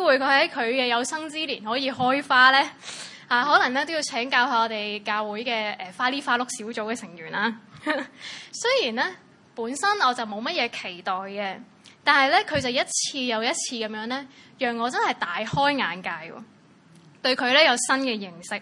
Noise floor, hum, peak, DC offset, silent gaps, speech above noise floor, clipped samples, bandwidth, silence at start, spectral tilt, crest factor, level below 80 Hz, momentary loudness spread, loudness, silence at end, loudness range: -53 dBFS; none; -2 dBFS; under 0.1%; none; 29 dB; under 0.1%; 11.5 kHz; 0 s; -2 dB/octave; 22 dB; -68 dBFS; 14 LU; -23 LUFS; 0 s; 6 LU